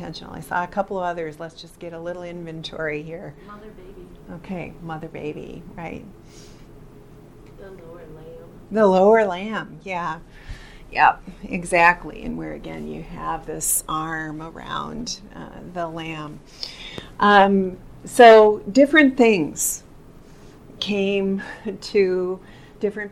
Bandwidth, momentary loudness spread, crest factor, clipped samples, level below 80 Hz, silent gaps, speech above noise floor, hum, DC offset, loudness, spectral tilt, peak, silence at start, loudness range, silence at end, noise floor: 16.5 kHz; 24 LU; 20 dB; under 0.1%; -46 dBFS; none; 24 dB; none; under 0.1%; -19 LUFS; -4 dB/octave; -2 dBFS; 0 s; 20 LU; 0 s; -44 dBFS